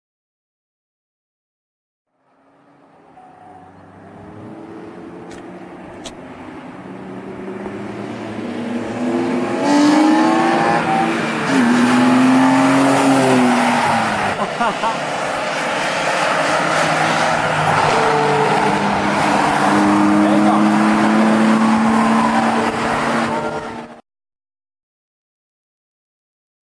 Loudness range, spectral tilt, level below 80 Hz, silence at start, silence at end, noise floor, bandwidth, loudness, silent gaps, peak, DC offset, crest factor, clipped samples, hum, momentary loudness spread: 19 LU; -5 dB/octave; -52 dBFS; 3.15 s; 2.75 s; -56 dBFS; 11 kHz; -15 LUFS; none; -2 dBFS; under 0.1%; 14 dB; under 0.1%; none; 21 LU